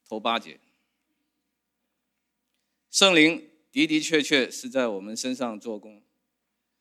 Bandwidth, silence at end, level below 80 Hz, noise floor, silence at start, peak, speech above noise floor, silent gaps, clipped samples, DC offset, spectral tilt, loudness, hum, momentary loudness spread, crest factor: 14.5 kHz; 0.9 s; -86 dBFS; -80 dBFS; 0.1 s; -4 dBFS; 56 dB; none; under 0.1%; under 0.1%; -2.5 dB/octave; -23 LUFS; none; 16 LU; 24 dB